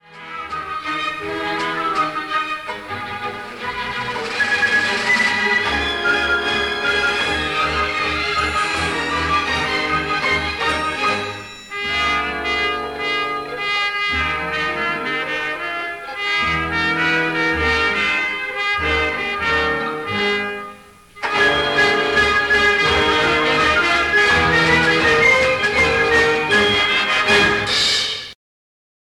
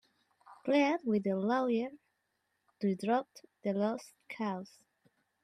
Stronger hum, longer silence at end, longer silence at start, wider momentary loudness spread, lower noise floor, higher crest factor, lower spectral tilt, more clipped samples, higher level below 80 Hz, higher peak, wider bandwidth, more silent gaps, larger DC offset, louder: neither; about the same, 0.85 s vs 0.8 s; second, 0.1 s vs 0.5 s; second, 11 LU vs 14 LU; second, -42 dBFS vs -81 dBFS; about the same, 14 dB vs 18 dB; second, -3 dB/octave vs -6.5 dB/octave; neither; first, -40 dBFS vs -84 dBFS; first, -4 dBFS vs -16 dBFS; first, 16.5 kHz vs 13 kHz; neither; neither; first, -17 LUFS vs -34 LUFS